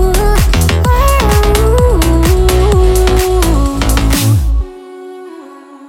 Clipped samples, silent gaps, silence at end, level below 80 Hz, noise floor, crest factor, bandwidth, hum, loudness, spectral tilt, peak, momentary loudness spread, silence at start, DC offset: under 0.1%; none; 0 s; -12 dBFS; -33 dBFS; 10 dB; 17 kHz; none; -11 LUFS; -5.5 dB/octave; 0 dBFS; 19 LU; 0 s; under 0.1%